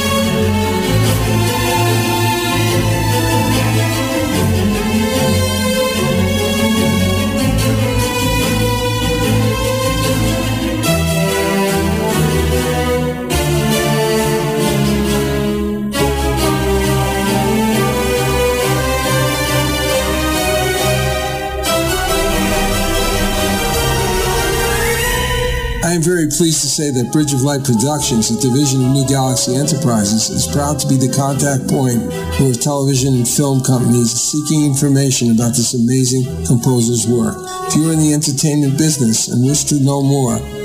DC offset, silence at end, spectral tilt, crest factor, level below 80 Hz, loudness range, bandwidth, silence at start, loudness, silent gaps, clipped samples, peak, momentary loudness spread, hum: under 0.1%; 0 s; -4.5 dB/octave; 12 dB; -28 dBFS; 2 LU; 16 kHz; 0 s; -14 LUFS; none; under 0.1%; -2 dBFS; 3 LU; none